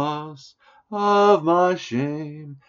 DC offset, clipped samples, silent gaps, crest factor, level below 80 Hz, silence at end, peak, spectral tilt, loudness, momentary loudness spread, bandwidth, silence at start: under 0.1%; under 0.1%; none; 18 dB; -72 dBFS; 0.1 s; -4 dBFS; -5 dB/octave; -20 LUFS; 17 LU; 7.4 kHz; 0 s